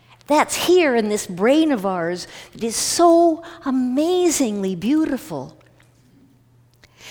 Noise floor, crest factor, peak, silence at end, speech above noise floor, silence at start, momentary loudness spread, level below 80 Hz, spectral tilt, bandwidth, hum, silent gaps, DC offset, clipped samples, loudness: -54 dBFS; 16 dB; -2 dBFS; 0 s; 36 dB; 0.3 s; 13 LU; -56 dBFS; -4 dB/octave; over 20 kHz; none; none; under 0.1%; under 0.1%; -19 LUFS